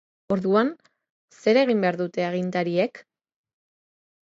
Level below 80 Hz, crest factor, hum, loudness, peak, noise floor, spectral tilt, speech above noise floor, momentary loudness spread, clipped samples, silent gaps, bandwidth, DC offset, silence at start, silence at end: -70 dBFS; 18 dB; none; -24 LUFS; -6 dBFS; under -90 dBFS; -7 dB/octave; over 67 dB; 8 LU; under 0.1%; 1.10-1.28 s; 7.8 kHz; under 0.1%; 0.3 s; 1.2 s